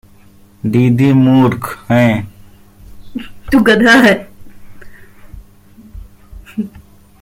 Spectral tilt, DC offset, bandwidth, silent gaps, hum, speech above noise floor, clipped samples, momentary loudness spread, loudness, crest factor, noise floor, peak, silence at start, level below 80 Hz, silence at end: -6.5 dB/octave; under 0.1%; 16.5 kHz; none; none; 33 dB; under 0.1%; 21 LU; -11 LUFS; 14 dB; -43 dBFS; 0 dBFS; 0.65 s; -40 dBFS; 0.55 s